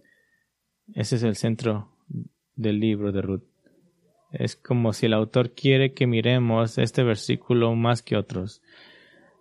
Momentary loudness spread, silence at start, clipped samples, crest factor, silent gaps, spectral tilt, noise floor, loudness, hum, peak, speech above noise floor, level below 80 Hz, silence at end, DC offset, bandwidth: 16 LU; 0.9 s; under 0.1%; 20 dB; none; -6.5 dB/octave; -75 dBFS; -24 LUFS; none; -6 dBFS; 52 dB; -62 dBFS; 0.9 s; under 0.1%; 11.5 kHz